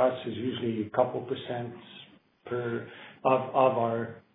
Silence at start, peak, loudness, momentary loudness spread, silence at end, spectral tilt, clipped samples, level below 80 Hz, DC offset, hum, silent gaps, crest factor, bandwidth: 0 s; -10 dBFS; -30 LUFS; 17 LU; 0.15 s; -10 dB/octave; under 0.1%; -74 dBFS; under 0.1%; none; none; 20 dB; 4 kHz